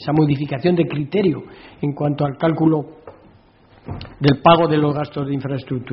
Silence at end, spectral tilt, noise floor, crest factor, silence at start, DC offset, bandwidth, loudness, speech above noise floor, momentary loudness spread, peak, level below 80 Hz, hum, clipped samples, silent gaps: 0 s; -6 dB/octave; -50 dBFS; 18 dB; 0 s; under 0.1%; 5.8 kHz; -19 LUFS; 32 dB; 14 LU; 0 dBFS; -50 dBFS; none; under 0.1%; none